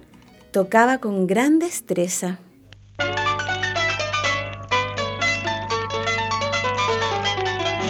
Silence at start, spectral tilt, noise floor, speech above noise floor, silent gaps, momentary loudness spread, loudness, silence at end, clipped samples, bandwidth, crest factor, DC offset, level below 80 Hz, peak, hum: 0.55 s; -4 dB/octave; -49 dBFS; 29 dB; none; 7 LU; -22 LUFS; 0 s; under 0.1%; 19.5 kHz; 20 dB; under 0.1%; -50 dBFS; -2 dBFS; none